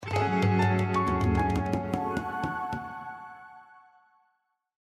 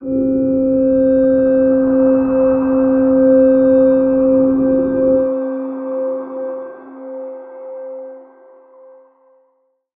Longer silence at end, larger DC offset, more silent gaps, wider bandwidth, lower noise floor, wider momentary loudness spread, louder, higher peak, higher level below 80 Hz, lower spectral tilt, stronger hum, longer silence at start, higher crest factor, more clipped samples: second, 1.2 s vs 1.75 s; neither; neither; first, 12.5 kHz vs 2.8 kHz; first, -75 dBFS vs -62 dBFS; second, 16 LU vs 19 LU; second, -28 LUFS vs -14 LUFS; second, -12 dBFS vs -2 dBFS; about the same, -44 dBFS vs -46 dBFS; second, -7.5 dB/octave vs -13 dB/octave; neither; about the same, 0 s vs 0 s; about the same, 16 dB vs 12 dB; neither